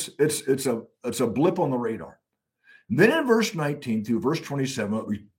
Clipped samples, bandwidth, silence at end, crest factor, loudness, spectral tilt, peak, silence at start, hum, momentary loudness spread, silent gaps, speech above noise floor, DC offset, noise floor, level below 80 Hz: under 0.1%; 16.5 kHz; 0.15 s; 20 dB; -25 LUFS; -5 dB/octave; -6 dBFS; 0 s; none; 10 LU; none; 38 dB; under 0.1%; -63 dBFS; -66 dBFS